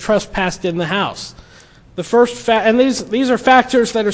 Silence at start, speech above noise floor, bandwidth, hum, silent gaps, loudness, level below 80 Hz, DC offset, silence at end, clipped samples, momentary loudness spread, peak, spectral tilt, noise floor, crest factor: 0 s; 29 dB; 8 kHz; none; none; -15 LUFS; -44 dBFS; under 0.1%; 0 s; under 0.1%; 15 LU; 0 dBFS; -4.5 dB/octave; -44 dBFS; 16 dB